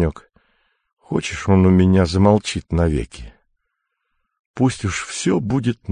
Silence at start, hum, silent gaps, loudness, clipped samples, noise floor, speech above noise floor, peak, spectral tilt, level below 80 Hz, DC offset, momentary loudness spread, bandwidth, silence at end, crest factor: 0 s; none; 0.93-0.97 s, 4.39-4.54 s; -18 LUFS; under 0.1%; -75 dBFS; 58 dB; -2 dBFS; -6.5 dB/octave; -32 dBFS; under 0.1%; 11 LU; 10 kHz; 0 s; 18 dB